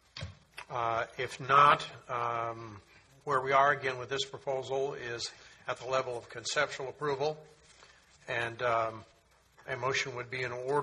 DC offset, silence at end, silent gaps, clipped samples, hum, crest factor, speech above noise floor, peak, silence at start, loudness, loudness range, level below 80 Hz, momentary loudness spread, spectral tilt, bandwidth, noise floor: under 0.1%; 0 s; none; under 0.1%; none; 24 dB; 31 dB; -8 dBFS; 0.15 s; -32 LUFS; 7 LU; -68 dBFS; 19 LU; -3.5 dB/octave; 12 kHz; -63 dBFS